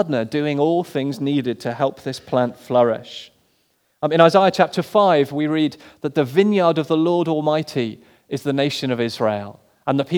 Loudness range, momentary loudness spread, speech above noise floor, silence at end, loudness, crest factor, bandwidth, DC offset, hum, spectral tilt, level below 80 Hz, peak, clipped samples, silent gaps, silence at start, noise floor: 5 LU; 12 LU; 46 dB; 0 s; -19 LUFS; 20 dB; 18.5 kHz; under 0.1%; none; -6.5 dB/octave; -68 dBFS; 0 dBFS; under 0.1%; none; 0 s; -65 dBFS